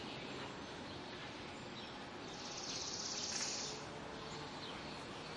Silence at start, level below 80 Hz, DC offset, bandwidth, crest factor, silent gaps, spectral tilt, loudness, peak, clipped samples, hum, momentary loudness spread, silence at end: 0 s; -70 dBFS; under 0.1%; 11.5 kHz; 18 dB; none; -2 dB/octave; -45 LUFS; -28 dBFS; under 0.1%; none; 9 LU; 0 s